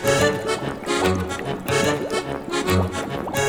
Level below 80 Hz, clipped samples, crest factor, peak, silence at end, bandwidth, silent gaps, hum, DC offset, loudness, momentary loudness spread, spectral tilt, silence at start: -44 dBFS; under 0.1%; 16 dB; -6 dBFS; 0 s; over 20 kHz; none; none; under 0.1%; -23 LUFS; 6 LU; -4.5 dB/octave; 0 s